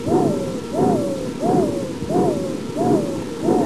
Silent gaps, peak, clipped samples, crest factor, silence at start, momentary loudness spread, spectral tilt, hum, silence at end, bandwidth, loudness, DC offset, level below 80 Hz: none; -6 dBFS; under 0.1%; 14 dB; 0 s; 6 LU; -7 dB/octave; none; 0 s; 14 kHz; -21 LUFS; 0.8%; -46 dBFS